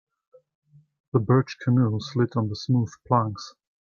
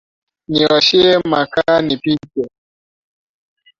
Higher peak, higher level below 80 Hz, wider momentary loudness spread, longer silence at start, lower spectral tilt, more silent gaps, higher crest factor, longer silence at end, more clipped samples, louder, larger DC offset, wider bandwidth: second, -6 dBFS vs 0 dBFS; second, -62 dBFS vs -52 dBFS; second, 8 LU vs 14 LU; first, 1.15 s vs 0.5 s; first, -8 dB/octave vs -5 dB/octave; neither; about the same, 20 dB vs 16 dB; second, 0.3 s vs 1.3 s; neither; second, -24 LUFS vs -14 LUFS; neither; about the same, 7 kHz vs 7.6 kHz